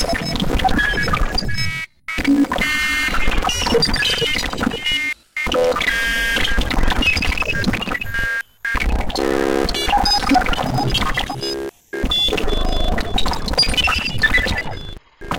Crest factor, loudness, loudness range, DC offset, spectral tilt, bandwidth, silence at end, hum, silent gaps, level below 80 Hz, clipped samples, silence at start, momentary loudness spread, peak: 14 dB; -18 LUFS; 2 LU; 0.9%; -3.5 dB/octave; 17 kHz; 0 s; none; none; -24 dBFS; under 0.1%; 0 s; 8 LU; -4 dBFS